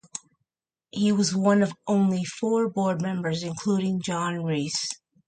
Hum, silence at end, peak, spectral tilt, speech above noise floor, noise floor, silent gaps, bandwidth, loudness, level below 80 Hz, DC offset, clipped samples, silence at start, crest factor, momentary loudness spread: none; 0.35 s; -10 dBFS; -5.5 dB/octave; 61 dB; -85 dBFS; none; 9.4 kHz; -25 LUFS; -68 dBFS; under 0.1%; under 0.1%; 0.15 s; 16 dB; 7 LU